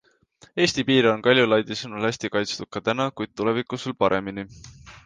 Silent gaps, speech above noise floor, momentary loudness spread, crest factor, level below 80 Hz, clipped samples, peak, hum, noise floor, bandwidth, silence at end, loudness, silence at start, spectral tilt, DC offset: none; 33 dB; 12 LU; 20 dB; -58 dBFS; under 0.1%; -4 dBFS; none; -56 dBFS; 9.8 kHz; 0.05 s; -23 LUFS; 0.55 s; -4.5 dB/octave; under 0.1%